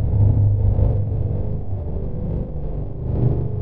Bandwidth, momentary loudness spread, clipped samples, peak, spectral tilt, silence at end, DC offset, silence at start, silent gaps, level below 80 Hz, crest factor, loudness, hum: 2.1 kHz; 11 LU; under 0.1%; -6 dBFS; -14 dB/octave; 0 s; 3%; 0 s; none; -26 dBFS; 14 dB; -22 LUFS; 50 Hz at -35 dBFS